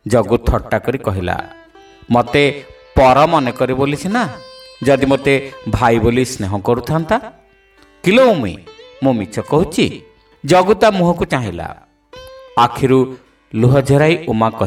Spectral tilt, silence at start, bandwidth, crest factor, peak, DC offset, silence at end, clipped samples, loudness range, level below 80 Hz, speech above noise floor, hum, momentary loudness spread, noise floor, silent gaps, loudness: -6.5 dB/octave; 0.05 s; 16 kHz; 14 dB; 0 dBFS; under 0.1%; 0 s; under 0.1%; 2 LU; -34 dBFS; 35 dB; none; 11 LU; -49 dBFS; none; -15 LUFS